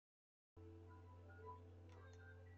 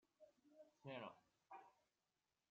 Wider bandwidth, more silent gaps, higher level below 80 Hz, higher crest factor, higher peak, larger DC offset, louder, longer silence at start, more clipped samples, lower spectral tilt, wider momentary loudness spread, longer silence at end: about the same, 7.4 kHz vs 7.2 kHz; neither; first, -82 dBFS vs under -90 dBFS; about the same, 16 dB vs 20 dB; second, -46 dBFS vs -42 dBFS; neither; second, -62 LUFS vs -59 LUFS; first, 0.55 s vs 0.2 s; neither; first, -6.5 dB/octave vs -4 dB/octave; second, 4 LU vs 9 LU; second, 0 s vs 0.7 s